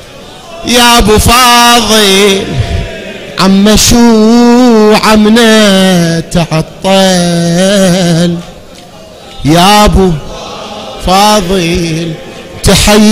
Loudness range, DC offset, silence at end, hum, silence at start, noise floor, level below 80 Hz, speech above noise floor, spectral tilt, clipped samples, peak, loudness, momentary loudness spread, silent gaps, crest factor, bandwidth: 5 LU; under 0.1%; 0 s; none; 0 s; -30 dBFS; -22 dBFS; 25 dB; -4 dB/octave; 1%; 0 dBFS; -5 LUFS; 16 LU; none; 6 dB; 16.5 kHz